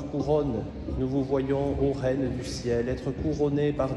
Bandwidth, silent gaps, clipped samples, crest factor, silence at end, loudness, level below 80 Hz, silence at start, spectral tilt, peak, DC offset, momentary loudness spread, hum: 11.5 kHz; none; under 0.1%; 14 dB; 0 s; -28 LUFS; -42 dBFS; 0 s; -7.5 dB/octave; -12 dBFS; under 0.1%; 5 LU; none